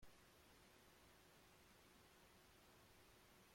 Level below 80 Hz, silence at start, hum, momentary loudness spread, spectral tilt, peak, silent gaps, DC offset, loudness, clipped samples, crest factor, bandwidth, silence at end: -80 dBFS; 0 s; none; 0 LU; -3 dB/octave; -52 dBFS; none; under 0.1%; -69 LUFS; under 0.1%; 16 dB; 16.5 kHz; 0 s